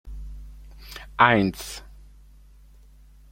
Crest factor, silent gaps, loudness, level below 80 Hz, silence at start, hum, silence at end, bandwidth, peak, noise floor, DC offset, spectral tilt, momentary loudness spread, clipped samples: 26 dB; none; -21 LUFS; -44 dBFS; 0.05 s; none; 1.55 s; 16.5 kHz; -2 dBFS; -50 dBFS; under 0.1%; -5 dB/octave; 27 LU; under 0.1%